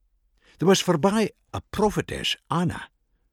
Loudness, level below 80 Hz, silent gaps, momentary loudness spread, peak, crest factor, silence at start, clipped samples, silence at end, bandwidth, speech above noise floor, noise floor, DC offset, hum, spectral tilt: -24 LUFS; -50 dBFS; none; 11 LU; -6 dBFS; 18 dB; 0.6 s; under 0.1%; 0.45 s; 17 kHz; 39 dB; -63 dBFS; under 0.1%; none; -5 dB/octave